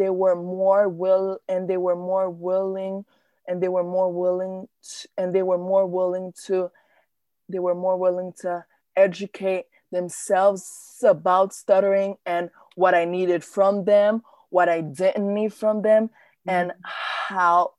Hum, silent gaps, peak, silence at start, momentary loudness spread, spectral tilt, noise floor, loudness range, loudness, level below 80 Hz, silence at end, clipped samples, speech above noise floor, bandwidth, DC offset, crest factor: none; none; -6 dBFS; 0 s; 12 LU; -5.5 dB/octave; -70 dBFS; 5 LU; -23 LUFS; -78 dBFS; 0.1 s; under 0.1%; 48 dB; 12.5 kHz; under 0.1%; 18 dB